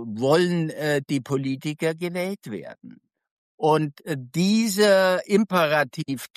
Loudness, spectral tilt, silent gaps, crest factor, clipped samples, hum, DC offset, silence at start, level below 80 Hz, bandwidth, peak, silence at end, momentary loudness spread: -23 LUFS; -5.5 dB/octave; 3.31-3.58 s; 16 dB; under 0.1%; none; under 0.1%; 0 s; -70 dBFS; 14.5 kHz; -8 dBFS; 0.1 s; 12 LU